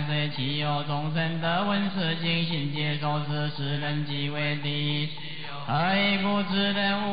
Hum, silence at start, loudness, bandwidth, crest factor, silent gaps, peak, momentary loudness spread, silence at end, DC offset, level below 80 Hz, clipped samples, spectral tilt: none; 0 s; -27 LUFS; 5.2 kHz; 12 dB; none; -14 dBFS; 6 LU; 0 s; 1%; -68 dBFS; under 0.1%; -10 dB/octave